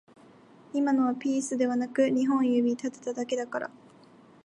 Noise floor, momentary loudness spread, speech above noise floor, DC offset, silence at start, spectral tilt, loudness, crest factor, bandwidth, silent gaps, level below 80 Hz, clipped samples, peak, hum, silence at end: -55 dBFS; 10 LU; 28 dB; under 0.1%; 0.75 s; -4.5 dB/octave; -28 LUFS; 16 dB; 10.5 kHz; none; -80 dBFS; under 0.1%; -12 dBFS; none; 0.75 s